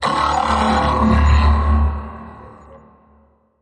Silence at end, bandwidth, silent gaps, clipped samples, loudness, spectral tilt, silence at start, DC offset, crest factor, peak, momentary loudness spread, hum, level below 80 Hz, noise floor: 0.85 s; 9.4 kHz; none; under 0.1%; -16 LUFS; -6.5 dB/octave; 0 s; under 0.1%; 14 dB; -4 dBFS; 19 LU; none; -22 dBFS; -54 dBFS